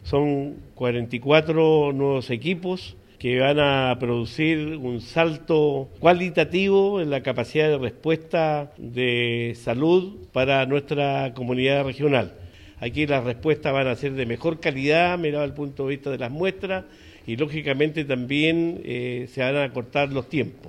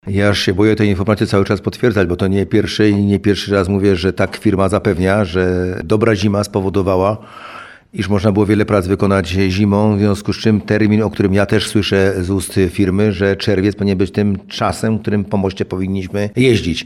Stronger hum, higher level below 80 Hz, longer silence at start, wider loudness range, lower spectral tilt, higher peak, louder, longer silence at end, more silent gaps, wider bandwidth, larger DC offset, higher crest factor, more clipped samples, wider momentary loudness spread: neither; second, -52 dBFS vs -40 dBFS; about the same, 0 s vs 0.05 s; about the same, 3 LU vs 2 LU; about the same, -7 dB/octave vs -6.5 dB/octave; about the same, -2 dBFS vs 0 dBFS; second, -23 LUFS vs -15 LUFS; about the same, 0 s vs 0 s; neither; second, 11.5 kHz vs 13.5 kHz; neither; first, 20 dB vs 14 dB; neither; first, 9 LU vs 5 LU